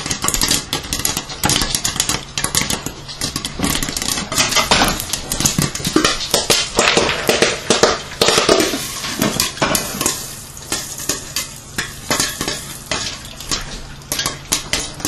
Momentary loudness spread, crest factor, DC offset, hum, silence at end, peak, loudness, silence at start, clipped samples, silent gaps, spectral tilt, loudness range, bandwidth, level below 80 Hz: 10 LU; 18 dB; under 0.1%; none; 0 s; 0 dBFS; -17 LUFS; 0 s; under 0.1%; none; -2 dB/octave; 7 LU; 16.5 kHz; -36 dBFS